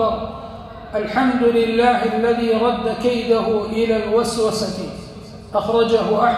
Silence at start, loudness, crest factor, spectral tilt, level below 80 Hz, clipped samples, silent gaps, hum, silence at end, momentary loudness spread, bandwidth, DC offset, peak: 0 s; -18 LUFS; 16 dB; -5 dB/octave; -44 dBFS; under 0.1%; none; none; 0 s; 15 LU; 14 kHz; under 0.1%; -2 dBFS